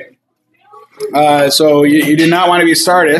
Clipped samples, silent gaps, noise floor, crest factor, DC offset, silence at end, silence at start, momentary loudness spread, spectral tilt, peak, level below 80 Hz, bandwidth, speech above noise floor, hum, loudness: under 0.1%; none; -59 dBFS; 10 dB; under 0.1%; 0 s; 0 s; 4 LU; -4 dB/octave; 0 dBFS; -64 dBFS; 15 kHz; 50 dB; none; -9 LUFS